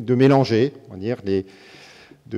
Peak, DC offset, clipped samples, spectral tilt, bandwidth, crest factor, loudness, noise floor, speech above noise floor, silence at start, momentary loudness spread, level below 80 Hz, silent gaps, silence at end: -2 dBFS; under 0.1%; under 0.1%; -8 dB/octave; 9.2 kHz; 18 dB; -20 LUFS; -46 dBFS; 27 dB; 0 s; 14 LU; -66 dBFS; none; 0 s